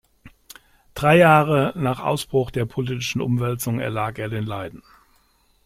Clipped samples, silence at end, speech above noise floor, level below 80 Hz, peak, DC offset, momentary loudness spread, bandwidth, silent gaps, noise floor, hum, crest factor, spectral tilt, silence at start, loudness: under 0.1%; 0.9 s; 41 dB; -50 dBFS; -2 dBFS; under 0.1%; 13 LU; 16 kHz; none; -61 dBFS; none; 20 dB; -6 dB/octave; 0.25 s; -21 LUFS